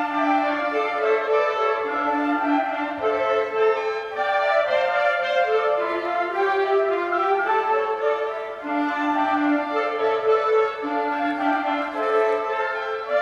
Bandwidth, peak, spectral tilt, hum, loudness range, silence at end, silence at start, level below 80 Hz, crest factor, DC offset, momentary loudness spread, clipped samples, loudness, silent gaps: 7.6 kHz; -8 dBFS; -4.5 dB/octave; none; 1 LU; 0 s; 0 s; -66 dBFS; 14 dB; under 0.1%; 4 LU; under 0.1%; -22 LUFS; none